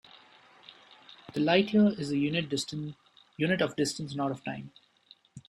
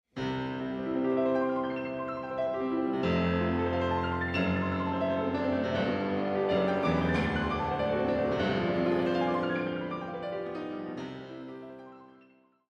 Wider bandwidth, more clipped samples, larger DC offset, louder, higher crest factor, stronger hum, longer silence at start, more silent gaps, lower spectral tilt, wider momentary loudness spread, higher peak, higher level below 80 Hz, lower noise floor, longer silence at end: first, 12.5 kHz vs 8.2 kHz; neither; neither; about the same, -29 LUFS vs -30 LUFS; first, 20 dB vs 14 dB; neither; about the same, 0.15 s vs 0.15 s; neither; second, -5 dB/octave vs -7.5 dB/octave; first, 16 LU vs 10 LU; first, -10 dBFS vs -16 dBFS; second, -68 dBFS vs -52 dBFS; about the same, -61 dBFS vs -62 dBFS; second, 0.1 s vs 0.65 s